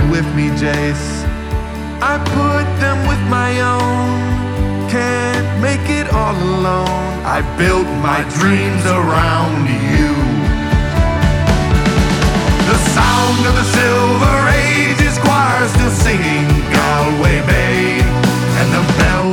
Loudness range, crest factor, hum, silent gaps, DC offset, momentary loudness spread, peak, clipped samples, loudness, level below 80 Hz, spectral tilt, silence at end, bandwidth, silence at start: 4 LU; 12 dB; none; none; under 0.1%; 6 LU; -2 dBFS; under 0.1%; -14 LUFS; -22 dBFS; -5.5 dB/octave; 0 s; 18 kHz; 0 s